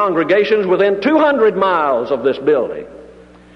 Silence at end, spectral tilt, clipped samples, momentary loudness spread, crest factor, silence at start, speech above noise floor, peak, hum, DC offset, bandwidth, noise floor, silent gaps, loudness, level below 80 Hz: 0.5 s; -7 dB/octave; under 0.1%; 5 LU; 12 dB; 0 s; 27 dB; -2 dBFS; none; under 0.1%; 6.2 kHz; -41 dBFS; none; -14 LUFS; -52 dBFS